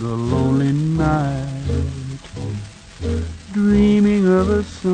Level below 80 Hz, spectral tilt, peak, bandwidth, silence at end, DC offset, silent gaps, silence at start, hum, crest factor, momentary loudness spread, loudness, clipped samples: -32 dBFS; -8 dB/octave; -4 dBFS; 9.6 kHz; 0 s; under 0.1%; none; 0 s; none; 14 dB; 15 LU; -19 LUFS; under 0.1%